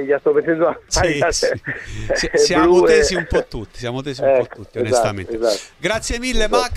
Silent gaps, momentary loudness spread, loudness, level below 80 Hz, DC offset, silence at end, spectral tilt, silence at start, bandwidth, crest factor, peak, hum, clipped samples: none; 13 LU; -18 LUFS; -32 dBFS; under 0.1%; 0 s; -4 dB/octave; 0 s; 14 kHz; 16 dB; -2 dBFS; none; under 0.1%